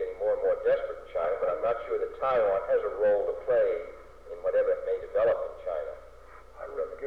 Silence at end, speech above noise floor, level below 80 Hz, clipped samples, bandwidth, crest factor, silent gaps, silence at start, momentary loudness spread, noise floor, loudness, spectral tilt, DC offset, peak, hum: 0 s; 24 dB; -56 dBFS; under 0.1%; 5 kHz; 10 dB; none; 0 s; 12 LU; -51 dBFS; -29 LUFS; -6 dB/octave; 0.2%; -18 dBFS; none